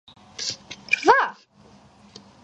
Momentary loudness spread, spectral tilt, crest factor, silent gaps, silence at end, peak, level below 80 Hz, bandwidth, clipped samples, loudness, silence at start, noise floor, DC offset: 18 LU; -2 dB/octave; 24 dB; none; 1.1 s; 0 dBFS; -62 dBFS; 9 kHz; under 0.1%; -22 LUFS; 0.4 s; -53 dBFS; under 0.1%